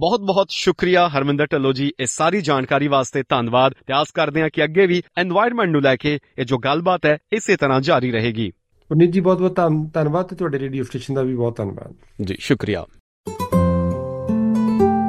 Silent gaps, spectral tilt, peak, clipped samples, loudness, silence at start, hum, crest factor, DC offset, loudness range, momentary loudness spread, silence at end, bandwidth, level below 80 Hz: 13.00-13.24 s; -5.5 dB/octave; -2 dBFS; under 0.1%; -19 LUFS; 0 s; none; 16 dB; under 0.1%; 5 LU; 9 LU; 0 s; 14 kHz; -50 dBFS